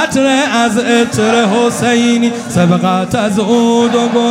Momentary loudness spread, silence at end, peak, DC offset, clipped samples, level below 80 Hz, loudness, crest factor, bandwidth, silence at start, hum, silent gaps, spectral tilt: 3 LU; 0 s; 0 dBFS; under 0.1%; under 0.1%; -48 dBFS; -11 LUFS; 10 dB; 15.5 kHz; 0 s; none; none; -5 dB/octave